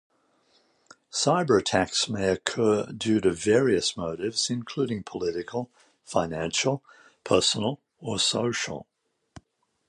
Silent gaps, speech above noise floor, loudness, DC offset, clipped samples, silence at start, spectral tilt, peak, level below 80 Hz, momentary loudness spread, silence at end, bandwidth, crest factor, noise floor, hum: none; 41 dB; -26 LUFS; under 0.1%; under 0.1%; 1.15 s; -3.5 dB/octave; -6 dBFS; -56 dBFS; 11 LU; 1.05 s; 11.5 kHz; 22 dB; -67 dBFS; none